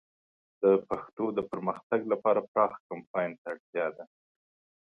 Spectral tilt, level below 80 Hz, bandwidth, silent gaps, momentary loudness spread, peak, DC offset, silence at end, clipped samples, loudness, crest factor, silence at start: -9 dB/octave; -72 dBFS; 4.3 kHz; 1.13-1.17 s, 1.83-1.90 s, 2.48-2.55 s, 2.80-2.90 s, 3.07-3.14 s, 3.38-3.45 s, 3.60-3.73 s; 11 LU; -10 dBFS; under 0.1%; 0.8 s; under 0.1%; -30 LUFS; 20 dB; 0.6 s